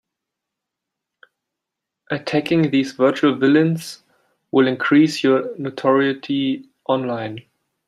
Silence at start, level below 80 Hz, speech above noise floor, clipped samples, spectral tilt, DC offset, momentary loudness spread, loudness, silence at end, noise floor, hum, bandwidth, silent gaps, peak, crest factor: 2.1 s; -66 dBFS; 65 dB; under 0.1%; -6.5 dB/octave; under 0.1%; 12 LU; -19 LUFS; 0.45 s; -83 dBFS; none; 13.5 kHz; none; -2 dBFS; 18 dB